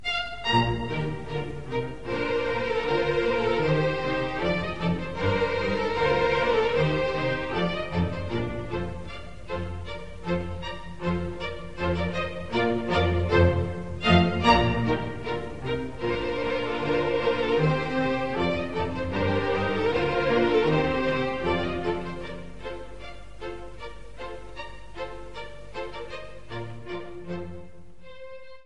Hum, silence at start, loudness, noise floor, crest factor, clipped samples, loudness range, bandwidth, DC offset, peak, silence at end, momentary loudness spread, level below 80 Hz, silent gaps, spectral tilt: none; 0 s; -26 LUFS; -49 dBFS; 22 dB; under 0.1%; 15 LU; 10.5 kHz; 1%; -6 dBFS; 0 s; 17 LU; -40 dBFS; none; -7 dB/octave